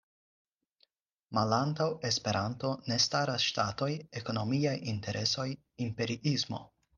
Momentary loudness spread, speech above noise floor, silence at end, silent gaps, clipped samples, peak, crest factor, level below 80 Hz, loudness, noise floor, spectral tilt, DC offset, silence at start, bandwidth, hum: 8 LU; 41 dB; 0.3 s; none; under 0.1%; -14 dBFS; 20 dB; -68 dBFS; -32 LUFS; -73 dBFS; -4.5 dB/octave; under 0.1%; 1.3 s; 10.5 kHz; none